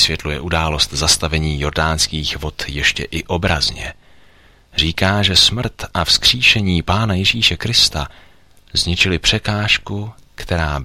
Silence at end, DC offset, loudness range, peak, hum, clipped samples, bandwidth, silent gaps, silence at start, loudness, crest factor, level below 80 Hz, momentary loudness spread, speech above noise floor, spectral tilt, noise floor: 0 s; under 0.1%; 6 LU; 0 dBFS; none; under 0.1%; 16 kHz; none; 0 s; -15 LUFS; 18 dB; -30 dBFS; 12 LU; 31 dB; -3 dB/octave; -48 dBFS